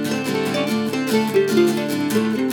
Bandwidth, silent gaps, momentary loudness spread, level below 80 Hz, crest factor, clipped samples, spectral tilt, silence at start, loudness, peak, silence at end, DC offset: 19.5 kHz; none; 4 LU; -72 dBFS; 16 dB; under 0.1%; -5 dB/octave; 0 s; -20 LUFS; -4 dBFS; 0 s; under 0.1%